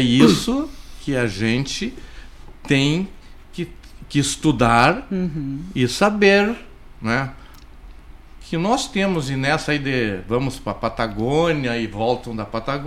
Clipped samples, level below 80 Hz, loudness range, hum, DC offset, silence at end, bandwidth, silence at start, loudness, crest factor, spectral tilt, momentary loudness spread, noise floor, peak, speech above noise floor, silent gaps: under 0.1%; -40 dBFS; 5 LU; none; under 0.1%; 0 s; 15.5 kHz; 0 s; -20 LUFS; 20 dB; -5 dB/octave; 16 LU; -40 dBFS; -2 dBFS; 21 dB; none